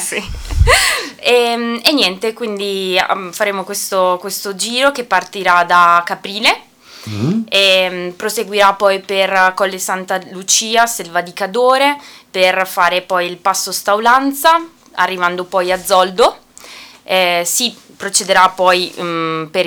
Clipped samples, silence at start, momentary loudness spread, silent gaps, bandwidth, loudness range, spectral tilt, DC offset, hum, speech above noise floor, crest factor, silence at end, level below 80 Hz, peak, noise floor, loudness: under 0.1%; 0 s; 10 LU; none; over 20 kHz; 2 LU; -2.5 dB/octave; under 0.1%; none; 22 dB; 14 dB; 0 s; -32 dBFS; 0 dBFS; -37 dBFS; -14 LUFS